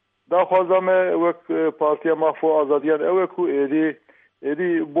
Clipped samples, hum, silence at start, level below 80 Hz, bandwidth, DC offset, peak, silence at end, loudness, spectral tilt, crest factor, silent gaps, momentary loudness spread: under 0.1%; none; 0.3 s; -78 dBFS; 3.8 kHz; under 0.1%; -6 dBFS; 0 s; -20 LUFS; -10 dB/octave; 14 dB; none; 6 LU